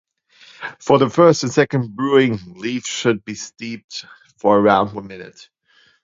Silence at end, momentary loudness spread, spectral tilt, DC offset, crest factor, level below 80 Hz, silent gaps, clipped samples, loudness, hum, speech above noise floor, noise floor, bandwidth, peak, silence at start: 0.75 s; 19 LU; -5.5 dB/octave; under 0.1%; 18 dB; -56 dBFS; 3.84-3.88 s; under 0.1%; -17 LUFS; none; 32 dB; -50 dBFS; 7.8 kHz; 0 dBFS; 0.6 s